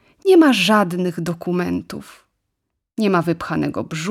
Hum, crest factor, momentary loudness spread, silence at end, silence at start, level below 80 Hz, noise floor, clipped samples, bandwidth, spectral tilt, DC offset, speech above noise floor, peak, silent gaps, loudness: none; 16 dB; 14 LU; 0 s; 0.25 s; -56 dBFS; -77 dBFS; under 0.1%; 15 kHz; -5.5 dB/octave; under 0.1%; 59 dB; -2 dBFS; none; -18 LUFS